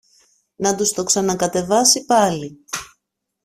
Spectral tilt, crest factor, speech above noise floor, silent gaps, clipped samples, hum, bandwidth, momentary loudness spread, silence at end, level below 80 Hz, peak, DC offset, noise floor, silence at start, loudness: -2.5 dB/octave; 18 dB; 57 dB; none; under 0.1%; none; 16 kHz; 15 LU; 0.6 s; -56 dBFS; -2 dBFS; under 0.1%; -75 dBFS; 0.6 s; -17 LUFS